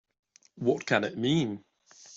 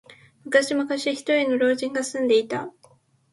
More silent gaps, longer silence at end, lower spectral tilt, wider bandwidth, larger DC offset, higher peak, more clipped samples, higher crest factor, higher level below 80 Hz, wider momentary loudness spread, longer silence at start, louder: neither; second, 0 s vs 0.65 s; first, -5.5 dB/octave vs -3 dB/octave; second, 7.8 kHz vs 11.5 kHz; neither; second, -10 dBFS vs -6 dBFS; neither; about the same, 20 dB vs 18 dB; about the same, -68 dBFS vs -72 dBFS; about the same, 7 LU vs 8 LU; first, 0.55 s vs 0.1 s; second, -29 LUFS vs -23 LUFS